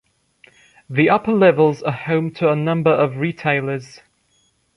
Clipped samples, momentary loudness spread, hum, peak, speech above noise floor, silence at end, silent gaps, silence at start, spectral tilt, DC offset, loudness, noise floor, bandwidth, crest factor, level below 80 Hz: under 0.1%; 10 LU; none; -2 dBFS; 45 dB; 0.9 s; none; 0.9 s; -8 dB/octave; under 0.1%; -18 LUFS; -62 dBFS; 10.5 kHz; 18 dB; -60 dBFS